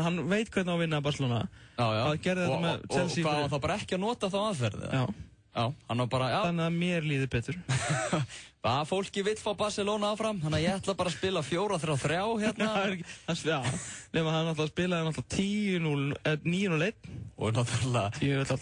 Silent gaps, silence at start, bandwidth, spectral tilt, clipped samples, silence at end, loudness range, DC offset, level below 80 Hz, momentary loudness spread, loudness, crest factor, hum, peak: none; 0 s; 10.5 kHz; -5.5 dB/octave; under 0.1%; 0 s; 1 LU; under 0.1%; -58 dBFS; 4 LU; -31 LUFS; 16 dB; none; -16 dBFS